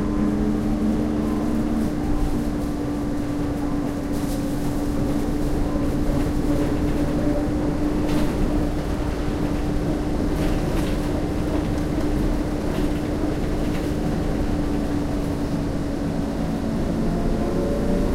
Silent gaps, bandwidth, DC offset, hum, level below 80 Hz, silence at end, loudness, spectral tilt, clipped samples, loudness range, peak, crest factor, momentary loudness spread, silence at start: none; 16 kHz; under 0.1%; none; -28 dBFS; 0 s; -24 LUFS; -7 dB/octave; under 0.1%; 2 LU; -8 dBFS; 14 dB; 3 LU; 0 s